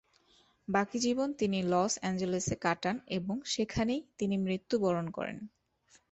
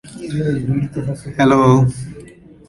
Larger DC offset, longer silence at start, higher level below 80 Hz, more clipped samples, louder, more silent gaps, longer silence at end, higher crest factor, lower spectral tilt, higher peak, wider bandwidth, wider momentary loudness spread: neither; first, 0.7 s vs 0.05 s; second, -60 dBFS vs -44 dBFS; neither; second, -33 LUFS vs -16 LUFS; neither; first, 0.65 s vs 0.4 s; about the same, 18 dB vs 16 dB; second, -4.5 dB/octave vs -7.5 dB/octave; second, -14 dBFS vs -2 dBFS; second, 8.4 kHz vs 11.5 kHz; second, 8 LU vs 14 LU